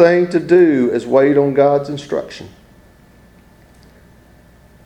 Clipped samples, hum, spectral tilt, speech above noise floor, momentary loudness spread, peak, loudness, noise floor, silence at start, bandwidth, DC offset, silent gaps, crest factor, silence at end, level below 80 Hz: under 0.1%; none; -7.5 dB/octave; 33 dB; 12 LU; 0 dBFS; -14 LUFS; -46 dBFS; 0 s; 8.8 kHz; under 0.1%; none; 16 dB; 2.4 s; -52 dBFS